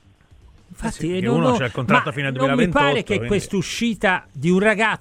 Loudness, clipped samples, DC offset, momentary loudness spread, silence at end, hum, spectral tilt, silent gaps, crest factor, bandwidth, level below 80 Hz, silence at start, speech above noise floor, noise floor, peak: -20 LUFS; under 0.1%; under 0.1%; 7 LU; 0.05 s; none; -5.5 dB/octave; none; 18 dB; 15 kHz; -44 dBFS; 0.8 s; 31 dB; -50 dBFS; -2 dBFS